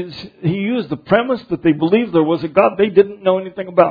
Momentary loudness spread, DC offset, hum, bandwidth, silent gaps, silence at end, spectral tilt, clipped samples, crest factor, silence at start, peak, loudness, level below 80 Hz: 7 LU; under 0.1%; none; 5 kHz; none; 0 s; -9.5 dB/octave; under 0.1%; 16 dB; 0 s; 0 dBFS; -16 LUFS; -52 dBFS